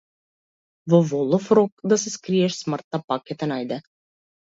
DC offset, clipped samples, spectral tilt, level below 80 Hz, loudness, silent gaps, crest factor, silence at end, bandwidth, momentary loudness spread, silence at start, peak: under 0.1%; under 0.1%; -6 dB/octave; -68 dBFS; -22 LUFS; 1.72-1.77 s, 2.84-2.91 s, 3.04-3.08 s; 20 dB; 0.6 s; 7.8 kHz; 10 LU; 0.85 s; -4 dBFS